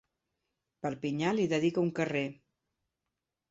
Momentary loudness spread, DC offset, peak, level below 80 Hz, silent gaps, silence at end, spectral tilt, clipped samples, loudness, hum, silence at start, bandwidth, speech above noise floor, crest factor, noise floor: 10 LU; under 0.1%; -16 dBFS; -72 dBFS; none; 1.15 s; -6.5 dB/octave; under 0.1%; -32 LUFS; none; 0.85 s; 8 kHz; 57 dB; 18 dB; -88 dBFS